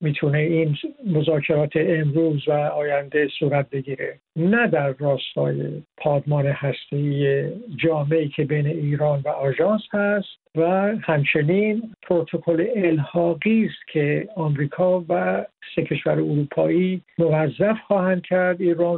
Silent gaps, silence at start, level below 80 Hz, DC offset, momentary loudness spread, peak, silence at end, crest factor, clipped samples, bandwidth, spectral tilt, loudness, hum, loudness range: none; 0 s; -62 dBFS; under 0.1%; 5 LU; -6 dBFS; 0 s; 16 dB; under 0.1%; 4.2 kHz; -12 dB/octave; -22 LUFS; none; 2 LU